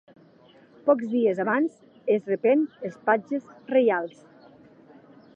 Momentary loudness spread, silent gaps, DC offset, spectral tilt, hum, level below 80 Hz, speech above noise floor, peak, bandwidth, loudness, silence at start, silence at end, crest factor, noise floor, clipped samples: 10 LU; none; under 0.1%; -7.5 dB/octave; none; -80 dBFS; 31 dB; -6 dBFS; 8 kHz; -25 LUFS; 0.85 s; 1.25 s; 20 dB; -55 dBFS; under 0.1%